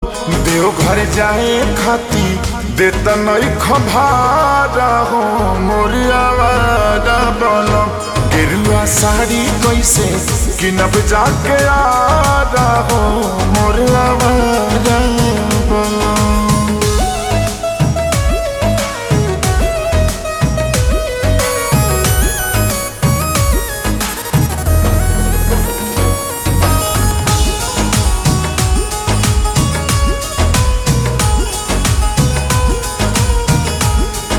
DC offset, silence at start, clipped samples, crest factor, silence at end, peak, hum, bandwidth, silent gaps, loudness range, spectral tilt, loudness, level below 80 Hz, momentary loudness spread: under 0.1%; 0 s; under 0.1%; 12 dB; 0 s; 0 dBFS; none; over 20 kHz; none; 3 LU; -4.5 dB/octave; -13 LUFS; -20 dBFS; 5 LU